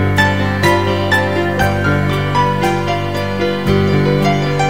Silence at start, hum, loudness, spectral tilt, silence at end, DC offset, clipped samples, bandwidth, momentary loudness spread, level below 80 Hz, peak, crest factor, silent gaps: 0 s; none; -15 LUFS; -6 dB/octave; 0 s; 2%; under 0.1%; 16.5 kHz; 4 LU; -36 dBFS; 0 dBFS; 14 dB; none